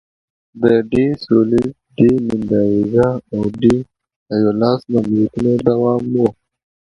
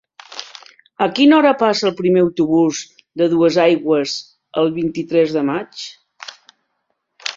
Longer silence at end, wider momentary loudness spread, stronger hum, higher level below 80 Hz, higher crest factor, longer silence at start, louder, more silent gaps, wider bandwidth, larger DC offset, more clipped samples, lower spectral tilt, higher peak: first, 0.5 s vs 0 s; second, 6 LU vs 20 LU; neither; first, -44 dBFS vs -60 dBFS; about the same, 16 dB vs 16 dB; first, 0.55 s vs 0.3 s; about the same, -16 LUFS vs -16 LUFS; first, 4.16-4.26 s vs none; first, 10.5 kHz vs 7.6 kHz; neither; neither; first, -9 dB/octave vs -5 dB/octave; about the same, 0 dBFS vs -2 dBFS